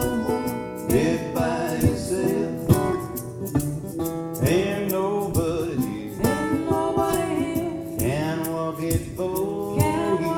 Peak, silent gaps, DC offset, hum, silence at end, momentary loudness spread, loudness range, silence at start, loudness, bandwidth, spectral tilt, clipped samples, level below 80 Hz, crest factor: -2 dBFS; none; under 0.1%; none; 0 s; 7 LU; 1 LU; 0 s; -24 LUFS; 19 kHz; -6 dB/octave; under 0.1%; -42 dBFS; 20 dB